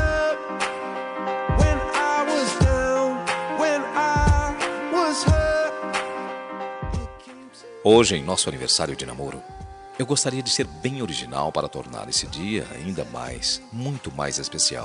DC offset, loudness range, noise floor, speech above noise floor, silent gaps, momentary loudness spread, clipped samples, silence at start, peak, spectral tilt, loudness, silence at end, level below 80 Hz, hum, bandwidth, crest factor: under 0.1%; 5 LU; -43 dBFS; 19 dB; none; 12 LU; under 0.1%; 0 s; -4 dBFS; -4 dB/octave; -23 LUFS; 0 s; -34 dBFS; none; 11 kHz; 20 dB